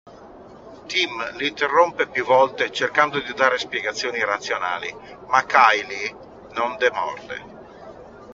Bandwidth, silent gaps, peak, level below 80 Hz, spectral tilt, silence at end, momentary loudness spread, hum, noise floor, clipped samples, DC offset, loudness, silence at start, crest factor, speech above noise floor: 7.6 kHz; none; 0 dBFS; -60 dBFS; 0 dB/octave; 0 s; 17 LU; none; -43 dBFS; under 0.1%; under 0.1%; -21 LUFS; 0.05 s; 22 dB; 22 dB